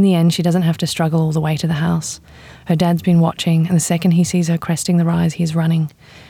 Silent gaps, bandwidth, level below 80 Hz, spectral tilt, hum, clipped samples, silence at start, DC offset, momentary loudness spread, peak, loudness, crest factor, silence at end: none; 15 kHz; -50 dBFS; -6 dB/octave; none; under 0.1%; 0 s; under 0.1%; 6 LU; -4 dBFS; -17 LUFS; 12 dB; 0.1 s